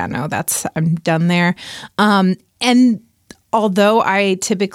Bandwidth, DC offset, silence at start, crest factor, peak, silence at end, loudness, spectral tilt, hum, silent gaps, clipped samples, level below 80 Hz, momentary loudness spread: 16 kHz; under 0.1%; 0 s; 12 dB; -2 dBFS; 0.05 s; -16 LUFS; -5 dB/octave; none; none; under 0.1%; -56 dBFS; 8 LU